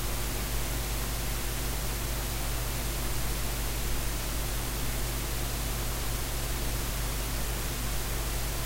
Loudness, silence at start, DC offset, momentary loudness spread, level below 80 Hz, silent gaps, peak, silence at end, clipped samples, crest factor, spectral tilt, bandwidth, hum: -32 LUFS; 0 s; under 0.1%; 0 LU; -34 dBFS; none; -18 dBFS; 0 s; under 0.1%; 12 dB; -3.5 dB/octave; 16 kHz; none